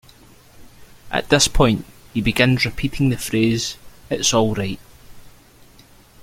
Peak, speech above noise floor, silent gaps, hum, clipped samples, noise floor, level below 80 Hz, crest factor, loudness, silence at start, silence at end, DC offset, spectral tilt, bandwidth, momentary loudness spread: 0 dBFS; 30 dB; none; none; under 0.1%; -48 dBFS; -34 dBFS; 20 dB; -19 LUFS; 0.6 s; 0.95 s; under 0.1%; -4 dB/octave; 16.5 kHz; 12 LU